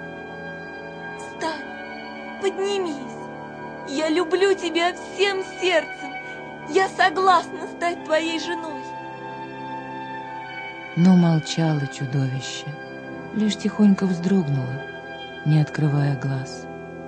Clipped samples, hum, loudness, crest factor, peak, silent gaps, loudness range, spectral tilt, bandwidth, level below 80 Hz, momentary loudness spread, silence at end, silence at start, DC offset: under 0.1%; none; -23 LUFS; 20 dB; -4 dBFS; none; 6 LU; -6 dB/octave; 9.6 kHz; -62 dBFS; 16 LU; 0 s; 0 s; under 0.1%